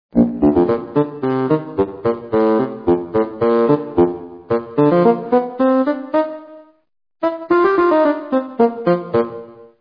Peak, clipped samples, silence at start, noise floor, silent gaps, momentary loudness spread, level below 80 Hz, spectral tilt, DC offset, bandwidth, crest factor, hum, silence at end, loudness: 0 dBFS; under 0.1%; 0.15 s; -42 dBFS; none; 8 LU; -48 dBFS; -10.5 dB/octave; under 0.1%; 5.2 kHz; 16 dB; none; 0.15 s; -17 LUFS